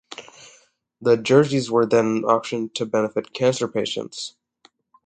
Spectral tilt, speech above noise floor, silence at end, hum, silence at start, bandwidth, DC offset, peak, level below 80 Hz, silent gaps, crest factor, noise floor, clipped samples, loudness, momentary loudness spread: -5.5 dB/octave; 39 dB; 0.75 s; none; 0.1 s; 9.4 kHz; under 0.1%; -2 dBFS; -64 dBFS; none; 20 dB; -59 dBFS; under 0.1%; -21 LUFS; 15 LU